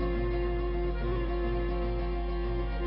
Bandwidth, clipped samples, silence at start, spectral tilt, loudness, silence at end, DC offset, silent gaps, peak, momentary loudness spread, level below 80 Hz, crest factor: 5.4 kHz; under 0.1%; 0 s; -7 dB/octave; -32 LUFS; 0 s; under 0.1%; none; -20 dBFS; 2 LU; -32 dBFS; 10 dB